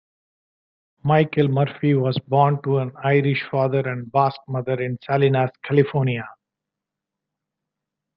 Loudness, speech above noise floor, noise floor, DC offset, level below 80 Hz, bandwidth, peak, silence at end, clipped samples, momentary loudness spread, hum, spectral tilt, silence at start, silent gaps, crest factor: -21 LUFS; 65 dB; -85 dBFS; under 0.1%; -62 dBFS; 5.4 kHz; -4 dBFS; 1.85 s; under 0.1%; 7 LU; none; -10.5 dB/octave; 1.05 s; none; 18 dB